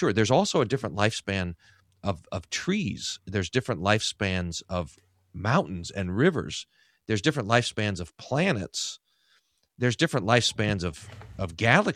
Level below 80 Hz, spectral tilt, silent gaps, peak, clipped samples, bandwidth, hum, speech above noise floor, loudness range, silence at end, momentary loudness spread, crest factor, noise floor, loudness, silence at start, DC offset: -54 dBFS; -4.5 dB/octave; none; -2 dBFS; under 0.1%; 14 kHz; none; 41 dB; 2 LU; 0 s; 13 LU; 26 dB; -68 dBFS; -27 LUFS; 0 s; under 0.1%